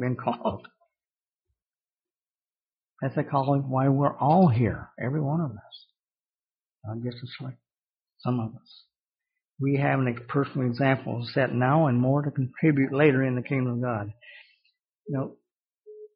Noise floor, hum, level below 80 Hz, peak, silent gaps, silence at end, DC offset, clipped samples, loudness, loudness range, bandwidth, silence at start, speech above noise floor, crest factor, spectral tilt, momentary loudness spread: under -90 dBFS; none; -62 dBFS; -6 dBFS; 1.92-1.96 s, 2.35-2.39 s, 2.62-2.66 s, 6.20-6.24 s, 6.54-6.58 s, 7.89-7.93 s, 8.99-9.03 s, 9.51-9.55 s; 0.1 s; under 0.1%; under 0.1%; -26 LUFS; 12 LU; 5.4 kHz; 0 s; over 65 dB; 20 dB; -7 dB/octave; 15 LU